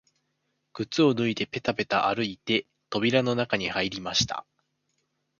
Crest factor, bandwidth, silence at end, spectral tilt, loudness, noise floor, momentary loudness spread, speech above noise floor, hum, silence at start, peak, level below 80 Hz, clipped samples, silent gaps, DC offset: 22 dB; 7.2 kHz; 1 s; -4.5 dB/octave; -26 LUFS; -77 dBFS; 7 LU; 50 dB; none; 0.75 s; -6 dBFS; -60 dBFS; under 0.1%; none; under 0.1%